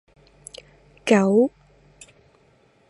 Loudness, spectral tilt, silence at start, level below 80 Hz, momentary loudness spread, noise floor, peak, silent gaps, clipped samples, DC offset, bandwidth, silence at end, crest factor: -20 LUFS; -6 dB/octave; 1.05 s; -62 dBFS; 25 LU; -59 dBFS; -2 dBFS; none; under 0.1%; under 0.1%; 11.5 kHz; 1.4 s; 22 dB